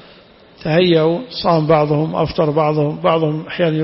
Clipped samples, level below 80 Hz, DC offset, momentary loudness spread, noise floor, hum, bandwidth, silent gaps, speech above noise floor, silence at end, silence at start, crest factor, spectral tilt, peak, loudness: under 0.1%; -46 dBFS; under 0.1%; 5 LU; -45 dBFS; none; 5.8 kHz; none; 29 dB; 0 s; 0.6 s; 14 dB; -10.5 dB/octave; -2 dBFS; -16 LUFS